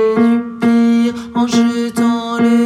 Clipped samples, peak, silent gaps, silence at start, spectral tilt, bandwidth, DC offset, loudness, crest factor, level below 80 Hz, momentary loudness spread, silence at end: under 0.1%; -2 dBFS; none; 0 s; -5.5 dB/octave; 13 kHz; under 0.1%; -14 LUFS; 10 dB; -56 dBFS; 4 LU; 0 s